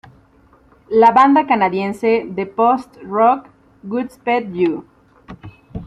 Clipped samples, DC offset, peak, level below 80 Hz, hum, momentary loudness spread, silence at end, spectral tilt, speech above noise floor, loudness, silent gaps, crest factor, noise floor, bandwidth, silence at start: under 0.1%; under 0.1%; -2 dBFS; -50 dBFS; none; 13 LU; 0 s; -7 dB/octave; 36 dB; -16 LUFS; none; 16 dB; -51 dBFS; 12 kHz; 0.9 s